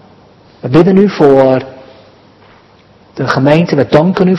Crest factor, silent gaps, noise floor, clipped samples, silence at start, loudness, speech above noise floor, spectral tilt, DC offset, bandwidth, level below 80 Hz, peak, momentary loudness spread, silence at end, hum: 10 dB; none; -43 dBFS; 2%; 0.65 s; -9 LUFS; 35 dB; -8 dB/octave; under 0.1%; 7.4 kHz; -44 dBFS; 0 dBFS; 16 LU; 0 s; none